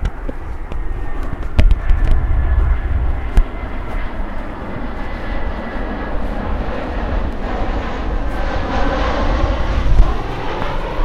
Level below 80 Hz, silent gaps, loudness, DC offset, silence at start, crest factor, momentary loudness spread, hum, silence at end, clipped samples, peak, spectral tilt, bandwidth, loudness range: -18 dBFS; none; -22 LUFS; under 0.1%; 0 s; 16 dB; 10 LU; none; 0 s; under 0.1%; 0 dBFS; -7.5 dB/octave; 6.8 kHz; 5 LU